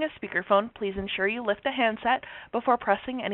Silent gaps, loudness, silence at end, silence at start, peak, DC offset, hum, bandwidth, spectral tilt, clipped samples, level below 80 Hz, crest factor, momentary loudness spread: none; -27 LUFS; 0 s; 0 s; -8 dBFS; under 0.1%; none; 4.2 kHz; -2 dB/octave; under 0.1%; -56 dBFS; 20 dB; 7 LU